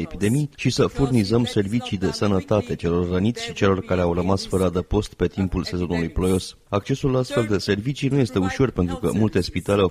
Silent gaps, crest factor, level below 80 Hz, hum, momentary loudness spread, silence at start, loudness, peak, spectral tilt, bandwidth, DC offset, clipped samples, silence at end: none; 18 dB; -38 dBFS; none; 4 LU; 0 s; -22 LUFS; -4 dBFS; -6.5 dB/octave; 15 kHz; under 0.1%; under 0.1%; 0 s